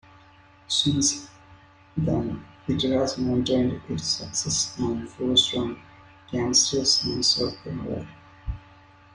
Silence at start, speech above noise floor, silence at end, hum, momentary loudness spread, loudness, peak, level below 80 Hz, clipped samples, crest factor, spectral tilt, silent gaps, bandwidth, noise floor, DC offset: 0.7 s; 28 dB; 0.55 s; none; 16 LU; -24 LUFS; -8 dBFS; -48 dBFS; under 0.1%; 20 dB; -3.5 dB/octave; none; 11 kHz; -53 dBFS; under 0.1%